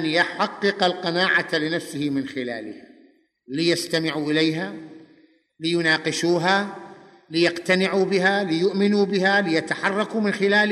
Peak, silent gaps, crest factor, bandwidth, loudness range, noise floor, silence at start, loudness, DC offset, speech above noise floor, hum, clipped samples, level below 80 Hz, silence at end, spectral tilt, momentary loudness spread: -6 dBFS; none; 18 dB; 13 kHz; 5 LU; -57 dBFS; 0 s; -22 LUFS; under 0.1%; 35 dB; none; under 0.1%; -70 dBFS; 0 s; -4.5 dB/octave; 10 LU